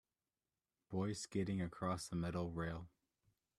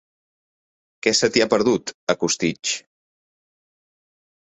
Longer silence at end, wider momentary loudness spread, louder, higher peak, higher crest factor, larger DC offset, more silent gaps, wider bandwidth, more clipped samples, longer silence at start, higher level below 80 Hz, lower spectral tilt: second, 0.7 s vs 1.7 s; about the same, 6 LU vs 8 LU; second, -43 LUFS vs -21 LUFS; second, -26 dBFS vs -2 dBFS; about the same, 18 dB vs 22 dB; neither; second, none vs 1.94-2.07 s; first, 13 kHz vs 8.4 kHz; neither; second, 0.9 s vs 1.05 s; second, -66 dBFS vs -60 dBFS; first, -6 dB/octave vs -3 dB/octave